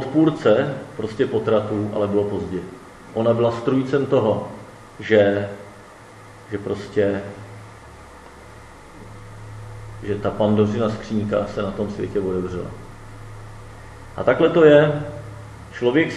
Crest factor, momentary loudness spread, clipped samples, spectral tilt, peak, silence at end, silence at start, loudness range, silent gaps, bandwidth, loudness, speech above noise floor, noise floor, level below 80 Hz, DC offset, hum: 22 dB; 24 LU; under 0.1%; -7.5 dB/octave; 0 dBFS; 0 s; 0 s; 9 LU; none; 12 kHz; -20 LUFS; 23 dB; -43 dBFS; -48 dBFS; under 0.1%; none